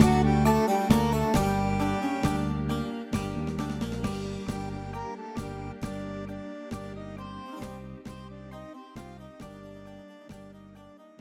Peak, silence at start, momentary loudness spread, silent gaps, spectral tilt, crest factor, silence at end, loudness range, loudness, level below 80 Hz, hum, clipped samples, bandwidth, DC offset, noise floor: -6 dBFS; 0 s; 22 LU; none; -6.5 dB/octave; 24 dB; 0.1 s; 17 LU; -29 LUFS; -42 dBFS; none; under 0.1%; 16.5 kHz; under 0.1%; -51 dBFS